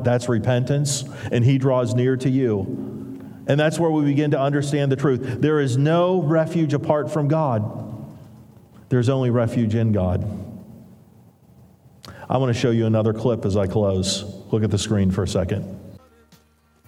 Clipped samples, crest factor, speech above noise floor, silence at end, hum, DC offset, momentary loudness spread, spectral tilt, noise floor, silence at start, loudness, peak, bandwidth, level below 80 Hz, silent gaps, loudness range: under 0.1%; 18 dB; 38 dB; 0.9 s; none; under 0.1%; 12 LU; -6.5 dB/octave; -58 dBFS; 0 s; -21 LUFS; -4 dBFS; 13 kHz; -56 dBFS; none; 4 LU